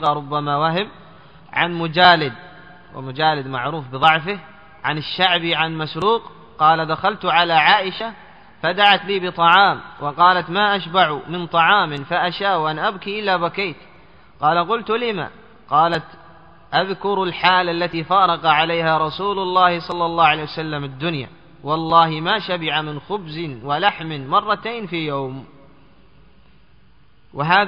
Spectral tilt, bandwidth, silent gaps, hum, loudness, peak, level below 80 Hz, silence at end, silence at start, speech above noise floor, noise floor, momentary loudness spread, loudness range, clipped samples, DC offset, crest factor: -1.5 dB/octave; 7.6 kHz; none; none; -18 LUFS; 0 dBFS; -56 dBFS; 0 s; 0 s; 36 dB; -54 dBFS; 13 LU; 6 LU; under 0.1%; 0.3%; 20 dB